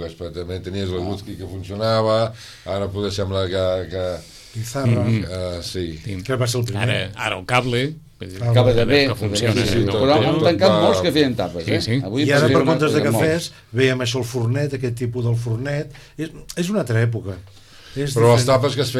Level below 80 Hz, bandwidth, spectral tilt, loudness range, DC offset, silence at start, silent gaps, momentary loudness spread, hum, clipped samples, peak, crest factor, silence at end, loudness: -42 dBFS; 14 kHz; -5.5 dB/octave; 6 LU; under 0.1%; 0 s; none; 15 LU; none; under 0.1%; -2 dBFS; 16 dB; 0 s; -20 LUFS